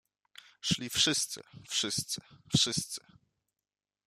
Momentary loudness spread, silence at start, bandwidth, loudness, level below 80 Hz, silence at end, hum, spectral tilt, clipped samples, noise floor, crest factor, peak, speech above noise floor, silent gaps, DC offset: 13 LU; 0.65 s; 15 kHz; -31 LUFS; -64 dBFS; 1.1 s; none; -2 dB/octave; under 0.1%; under -90 dBFS; 24 dB; -12 dBFS; over 57 dB; none; under 0.1%